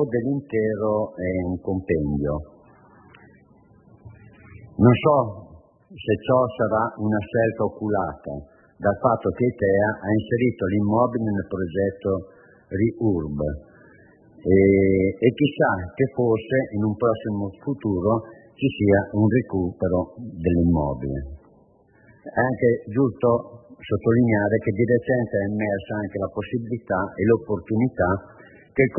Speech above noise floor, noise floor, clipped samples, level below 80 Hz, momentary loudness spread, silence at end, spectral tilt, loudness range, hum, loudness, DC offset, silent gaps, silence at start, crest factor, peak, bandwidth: 34 dB; -56 dBFS; under 0.1%; -48 dBFS; 10 LU; 0 s; -12.5 dB/octave; 4 LU; none; -23 LUFS; under 0.1%; none; 0 s; 18 dB; -4 dBFS; 3.2 kHz